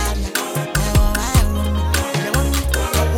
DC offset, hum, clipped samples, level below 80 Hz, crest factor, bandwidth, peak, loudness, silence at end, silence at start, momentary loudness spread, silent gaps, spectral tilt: under 0.1%; none; under 0.1%; -20 dBFS; 16 dB; 17.5 kHz; -2 dBFS; -19 LUFS; 0 s; 0 s; 4 LU; none; -4.5 dB/octave